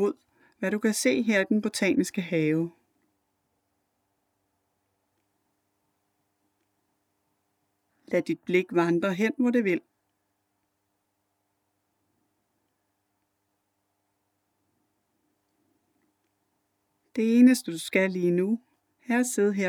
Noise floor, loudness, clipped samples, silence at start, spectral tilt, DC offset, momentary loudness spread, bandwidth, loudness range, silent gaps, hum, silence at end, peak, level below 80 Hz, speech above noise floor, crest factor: -77 dBFS; -25 LUFS; under 0.1%; 0 s; -5 dB/octave; under 0.1%; 9 LU; 17.5 kHz; 10 LU; none; none; 0 s; -8 dBFS; -80 dBFS; 53 dB; 22 dB